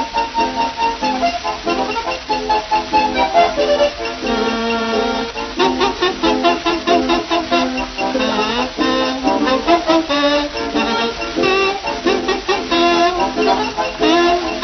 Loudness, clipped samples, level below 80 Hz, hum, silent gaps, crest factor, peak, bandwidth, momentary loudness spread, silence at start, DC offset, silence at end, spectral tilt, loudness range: -16 LUFS; under 0.1%; -40 dBFS; none; none; 16 dB; 0 dBFS; 6.4 kHz; 6 LU; 0 s; under 0.1%; 0 s; -3.5 dB/octave; 1 LU